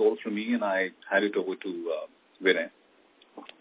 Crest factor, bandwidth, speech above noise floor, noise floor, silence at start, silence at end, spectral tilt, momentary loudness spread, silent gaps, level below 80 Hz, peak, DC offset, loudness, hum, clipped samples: 20 dB; 4 kHz; 33 dB; -61 dBFS; 0 s; 0.15 s; -8.5 dB/octave; 14 LU; none; -86 dBFS; -8 dBFS; under 0.1%; -29 LUFS; none; under 0.1%